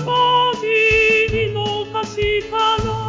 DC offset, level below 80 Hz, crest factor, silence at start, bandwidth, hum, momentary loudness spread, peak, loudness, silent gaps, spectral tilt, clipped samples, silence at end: under 0.1%; -36 dBFS; 12 dB; 0 s; 7.6 kHz; none; 9 LU; -6 dBFS; -16 LUFS; none; -4.5 dB/octave; under 0.1%; 0 s